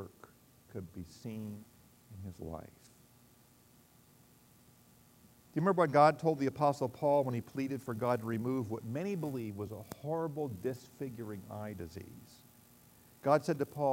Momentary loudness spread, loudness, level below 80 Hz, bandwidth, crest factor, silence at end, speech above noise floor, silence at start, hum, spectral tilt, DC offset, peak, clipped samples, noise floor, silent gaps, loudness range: 19 LU; -35 LUFS; -70 dBFS; 16 kHz; 24 dB; 0 s; 29 dB; 0 s; none; -7 dB/octave; under 0.1%; -12 dBFS; under 0.1%; -64 dBFS; none; 19 LU